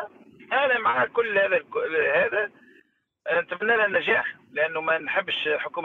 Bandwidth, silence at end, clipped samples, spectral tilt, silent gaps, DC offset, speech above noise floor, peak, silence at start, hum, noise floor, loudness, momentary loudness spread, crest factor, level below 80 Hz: 6.6 kHz; 0 s; under 0.1%; -5.5 dB/octave; none; under 0.1%; 37 dB; -10 dBFS; 0 s; none; -62 dBFS; -24 LUFS; 6 LU; 16 dB; -70 dBFS